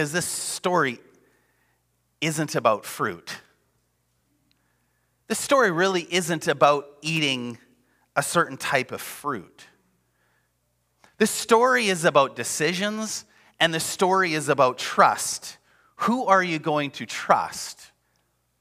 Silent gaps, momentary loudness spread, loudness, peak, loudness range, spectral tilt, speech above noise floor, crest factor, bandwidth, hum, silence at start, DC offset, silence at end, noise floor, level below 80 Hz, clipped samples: none; 12 LU; -23 LUFS; -4 dBFS; 7 LU; -3.5 dB/octave; 48 dB; 22 dB; 16 kHz; none; 0 s; under 0.1%; 0.75 s; -71 dBFS; -72 dBFS; under 0.1%